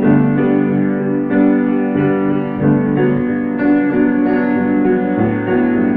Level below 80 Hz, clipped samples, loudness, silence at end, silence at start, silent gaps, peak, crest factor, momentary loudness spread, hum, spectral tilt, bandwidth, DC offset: -46 dBFS; under 0.1%; -15 LUFS; 0 s; 0 s; none; -2 dBFS; 12 dB; 3 LU; none; -11.5 dB/octave; 3.8 kHz; under 0.1%